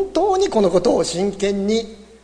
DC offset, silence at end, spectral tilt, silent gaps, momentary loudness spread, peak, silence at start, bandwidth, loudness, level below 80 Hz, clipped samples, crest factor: under 0.1%; 0.2 s; -5 dB/octave; none; 5 LU; -4 dBFS; 0 s; 10.5 kHz; -18 LUFS; -44 dBFS; under 0.1%; 14 dB